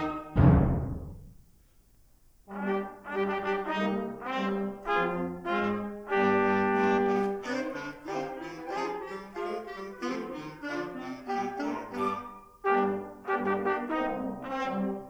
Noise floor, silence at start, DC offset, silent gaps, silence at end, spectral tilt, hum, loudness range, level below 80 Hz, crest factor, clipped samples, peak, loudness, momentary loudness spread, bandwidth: -60 dBFS; 0 s; under 0.1%; none; 0 s; -7.5 dB/octave; none; 8 LU; -44 dBFS; 22 dB; under 0.1%; -8 dBFS; -30 LUFS; 13 LU; over 20 kHz